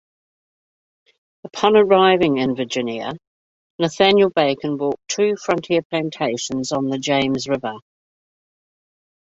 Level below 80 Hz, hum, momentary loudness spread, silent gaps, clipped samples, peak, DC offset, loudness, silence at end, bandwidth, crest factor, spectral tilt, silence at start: -58 dBFS; none; 12 LU; 3.27-3.79 s, 5.85-5.90 s; under 0.1%; -2 dBFS; under 0.1%; -19 LUFS; 1.6 s; 8 kHz; 20 dB; -4.5 dB/octave; 1.45 s